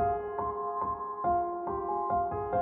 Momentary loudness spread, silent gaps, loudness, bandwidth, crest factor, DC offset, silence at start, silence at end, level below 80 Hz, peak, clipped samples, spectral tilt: 4 LU; none; -32 LUFS; 3.1 kHz; 12 dB; under 0.1%; 0 s; 0 s; -54 dBFS; -18 dBFS; under 0.1%; -8.5 dB/octave